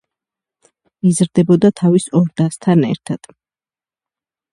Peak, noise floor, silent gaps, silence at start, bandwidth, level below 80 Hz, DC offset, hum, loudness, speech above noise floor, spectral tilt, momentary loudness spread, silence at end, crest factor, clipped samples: 0 dBFS; under -90 dBFS; none; 1.05 s; 11.5 kHz; -56 dBFS; under 0.1%; none; -15 LUFS; over 76 dB; -7 dB/octave; 10 LU; 1.35 s; 16 dB; under 0.1%